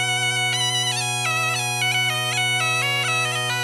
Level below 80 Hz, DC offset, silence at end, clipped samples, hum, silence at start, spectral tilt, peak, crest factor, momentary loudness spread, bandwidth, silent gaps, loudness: -64 dBFS; under 0.1%; 0 s; under 0.1%; none; 0 s; -1.5 dB/octave; -10 dBFS; 12 dB; 2 LU; 16 kHz; none; -20 LUFS